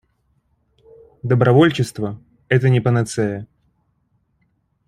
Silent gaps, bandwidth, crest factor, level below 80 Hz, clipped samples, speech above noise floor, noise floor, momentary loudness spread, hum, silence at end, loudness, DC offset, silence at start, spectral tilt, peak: none; 11.5 kHz; 18 dB; -54 dBFS; under 0.1%; 49 dB; -66 dBFS; 17 LU; none; 1.45 s; -17 LUFS; under 0.1%; 1.25 s; -7 dB/octave; -2 dBFS